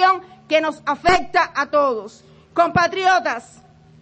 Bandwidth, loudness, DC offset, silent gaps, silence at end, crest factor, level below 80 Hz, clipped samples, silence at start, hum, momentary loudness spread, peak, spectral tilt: 8.4 kHz; -19 LUFS; under 0.1%; none; 0.6 s; 16 dB; -48 dBFS; under 0.1%; 0 s; none; 9 LU; -4 dBFS; -4 dB/octave